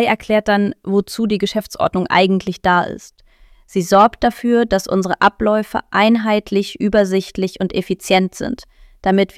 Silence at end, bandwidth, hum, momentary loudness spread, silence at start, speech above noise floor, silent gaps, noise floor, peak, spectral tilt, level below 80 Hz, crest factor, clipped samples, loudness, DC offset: 0.1 s; 15.5 kHz; none; 9 LU; 0 s; 32 dB; none; -48 dBFS; -2 dBFS; -5.5 dB/octave; -44 dBFS; 16 dB; under 0.1%; -17 LUFS; under 0.1%